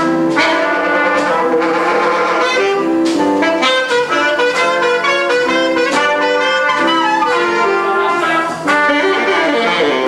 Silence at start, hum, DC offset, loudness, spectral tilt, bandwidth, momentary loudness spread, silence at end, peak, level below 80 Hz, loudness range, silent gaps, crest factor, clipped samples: 0 s; none; under 0.1%; -13 LUFS; -3.5 dB/octave; 13 kHz; 1 LU; 0 s; -2 dBFS; -56 dBFS; 0 LU; none; 12 dB; under 0.1%